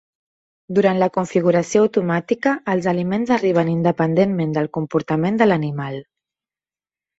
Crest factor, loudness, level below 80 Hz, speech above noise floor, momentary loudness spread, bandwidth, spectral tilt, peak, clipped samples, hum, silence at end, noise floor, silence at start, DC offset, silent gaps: 16 dB; -19 LUFS; -60 dBFS; over 72 dB; 6 LU; 8 kHz; -7 dB/octave; -2 dBFS; under 0.1%; none; 1.2 s; under -90 dBFS; 0.7 s; under 0.1%; none